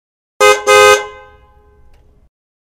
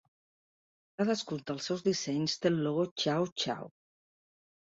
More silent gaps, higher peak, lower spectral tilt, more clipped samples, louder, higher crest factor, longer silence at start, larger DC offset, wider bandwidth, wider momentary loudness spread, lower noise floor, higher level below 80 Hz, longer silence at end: second, none vs 2.91-2.96 s, 3.32-3.36 s; first, 0 dBFS vs -14 dBFS; second, -0.5 dB/octave vs -5 dB/octave; first, 1% vs under 0.1%; first, -9 LUFS vs -32 LUFS; second, 14 dB vs 20 dB; second, 0.4 s vs 1 s; neither; first, over 20 kHz vs 8 kHz; about the same, 9 LU vs 7 LU; second, -45 dBFS vs under -90 dBFS; first, -48 dBFS vs -74 dBFS; first, 1.6 s vs 1 s